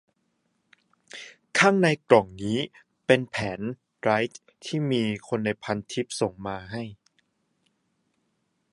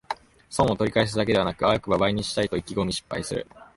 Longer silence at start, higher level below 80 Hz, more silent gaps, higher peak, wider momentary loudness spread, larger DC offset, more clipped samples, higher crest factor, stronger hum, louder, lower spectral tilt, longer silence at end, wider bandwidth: first, 1.15 s vs 0.1 s; second, -60 dBFS vs -46 dBFS; neither; first, -2 dBFS vs -6 dBFS; first, 16 LU vs 10 LU; neither; neither; first, 26 dB vs 18 dB; neither; about the same, -26 LUFS vs -25 LUFS; about the same, -5 dB/octave vs -5 dB/octave; first, 1.8 s vs 0.1 s; about the same, 11.5 kHz vs 11.5 kHz